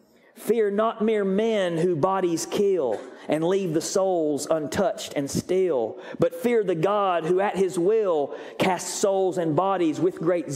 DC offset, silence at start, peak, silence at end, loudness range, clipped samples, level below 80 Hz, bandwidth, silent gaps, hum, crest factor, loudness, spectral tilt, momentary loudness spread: under 0.1%; 0.35 s; -6 dBFS; 0 s; 1 LU; under 0.1%; -62 dBFS; 16 kHz; none; none; 18 dB; -24 LUFS; -5 dB/octave; 4 LU